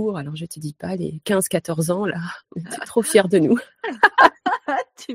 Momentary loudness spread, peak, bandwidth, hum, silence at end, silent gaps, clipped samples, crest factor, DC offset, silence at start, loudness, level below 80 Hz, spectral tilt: 16 LU; 0 dBFS; 16 kHz; none; 0 s; none; under 0.1%; 20 dB; under 0.1%; 0 s; -19 LUFS; -60 dBFS; -4.5 dB/octave